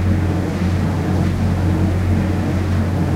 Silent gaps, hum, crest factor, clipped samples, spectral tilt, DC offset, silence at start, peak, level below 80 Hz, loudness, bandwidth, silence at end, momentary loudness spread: none; none; 12 dB; under 0.1%; -8 dB/octave; under 0.1%; 0 s; -4 dBFS; -30 dBFS; -18 LUFS; 12.5 kHz; 0 s; 2 LU